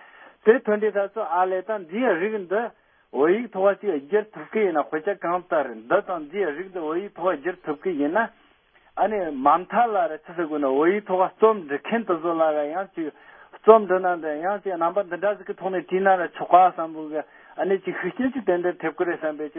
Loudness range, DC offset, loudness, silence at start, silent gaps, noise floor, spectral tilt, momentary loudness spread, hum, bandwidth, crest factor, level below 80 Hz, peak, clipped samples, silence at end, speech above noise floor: 4 LU; under 0.1%; -23 LUFS; 0.2 s; none; -58 dBFS; -10.5 dB/octave; 10 LU; none; 3.7 kHz; 22 dB; -70 dBFS; 0 dBFS; under 0.1%; 0 s; 36 dB